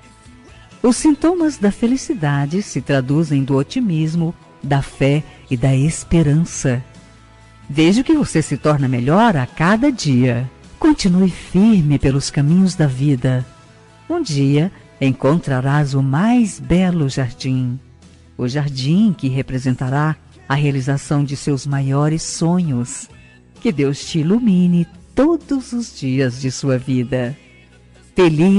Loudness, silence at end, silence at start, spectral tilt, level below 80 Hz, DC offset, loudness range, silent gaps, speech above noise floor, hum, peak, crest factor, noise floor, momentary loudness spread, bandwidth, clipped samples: -17 LUFS; 0 s; 0.25 s; -6.5 dB/octave; -40 dBFS; under 0.1%; 4 LU; none; 30 dB; none; -6 dBFS; 10 dB; -46 dBFS; 8 LU; 11.5 kHz; under 0.1%